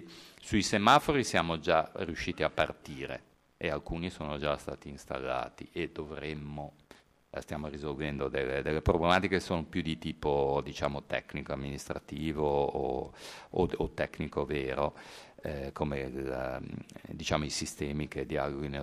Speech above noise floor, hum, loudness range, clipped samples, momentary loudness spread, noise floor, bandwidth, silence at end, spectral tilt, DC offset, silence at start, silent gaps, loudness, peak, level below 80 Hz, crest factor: 27 dB; none; 8 LU; under 0.1%; 13 LU; -60 dBFS; 15.5 kHz; 0 s; -5 dB/octave; under 0.1%; 0 s; none; -33 LUFS; -10 dBFS; -50 dBFS; 24 dB